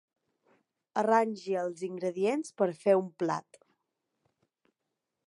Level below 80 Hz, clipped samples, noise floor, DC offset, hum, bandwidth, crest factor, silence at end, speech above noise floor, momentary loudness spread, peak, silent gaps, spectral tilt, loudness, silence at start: -88 dBFS; under 0.1%; -86 dBFS; under 0.1%; none; 11.5 kHz; 22 dB; 1.9 s; 56 dB; 9 LU; -12 dBFS; none; -6 dB/octave; -30 LUFS; 0.95 s